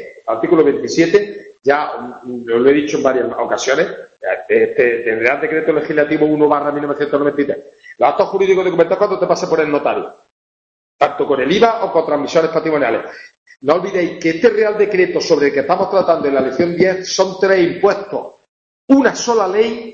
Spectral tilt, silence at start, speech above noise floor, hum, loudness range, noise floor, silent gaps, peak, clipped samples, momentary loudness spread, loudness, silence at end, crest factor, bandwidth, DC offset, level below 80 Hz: -5 dB/octave; 0 s; over 76 dB; none; 2 LU; under -90 dBFS; 10.31-10.99 s, 13.37-13.46 s, 18.49-18.88 s; 0 dBFS; under 0.1%; 9 LU; -15 LUFS; 0 s; 14 dB; 7.6 kHz; under 0.1%; -56 dBFS